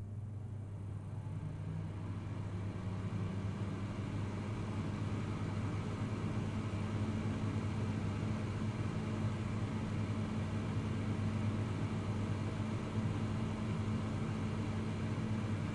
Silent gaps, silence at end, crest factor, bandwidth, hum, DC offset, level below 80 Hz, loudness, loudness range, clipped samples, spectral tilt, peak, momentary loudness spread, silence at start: none; 0 s; 14 dB; 11 kHz; none; under 0.1%; -54 dBFS; -39 LUFS; 3 LU; under 0.1%; -7.5 dB/octave; -24 dBFS; 5 LU; 0 s